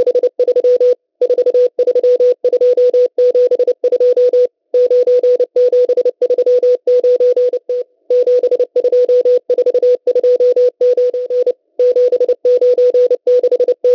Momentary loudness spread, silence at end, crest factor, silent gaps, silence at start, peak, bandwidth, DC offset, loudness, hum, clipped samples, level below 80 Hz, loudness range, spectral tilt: 4 LU; 0 s; 6 dB; none; 0 s; -6 dBFS; 6 kHz; under 0.1%; -12 LUFS; none; under 0.1%; -64 dBFS; 1 LU; -4.5 dB/octave